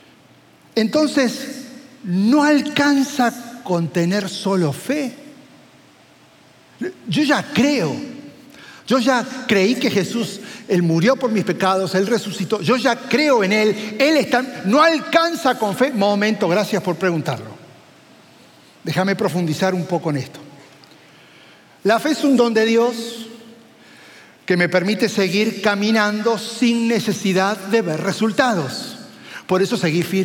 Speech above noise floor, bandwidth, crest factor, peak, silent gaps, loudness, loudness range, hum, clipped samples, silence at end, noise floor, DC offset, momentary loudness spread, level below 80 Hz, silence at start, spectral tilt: 32 dB; 17 kHz; 18 dB; -2 dBFS; none; -18 LUFS; 6 LU; none; under 0.1%; 0 s; -50 dBFS; under 0.1%; 14 LU; -70 dBFS; 0.75 s; -5 dB/octave